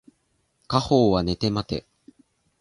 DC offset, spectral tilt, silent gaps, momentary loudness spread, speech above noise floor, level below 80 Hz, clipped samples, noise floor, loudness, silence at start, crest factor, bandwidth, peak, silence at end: under 0.1%; -6.5 dB/octave; none; 12 LU; 48 dB; -46 dBFS; under 0.1%; -70 dBFS; -23 LUFS; 0.7 s; 20 dB; 11.5 kHz; -6 dBFS; 0.8 s